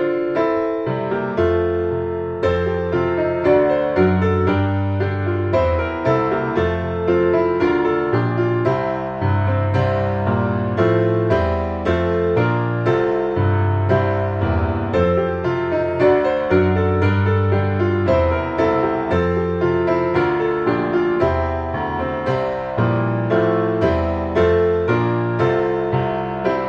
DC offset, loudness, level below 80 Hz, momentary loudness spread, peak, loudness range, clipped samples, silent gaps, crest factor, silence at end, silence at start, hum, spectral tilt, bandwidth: under 0.1%; -19 LUFS; -36 dBFS; 5 LU; -4 dBFS; 2 LU; under 0.1%; none; 14 dB; 0 s; 0 s; none; -9 dB/octave; 6.8 kHz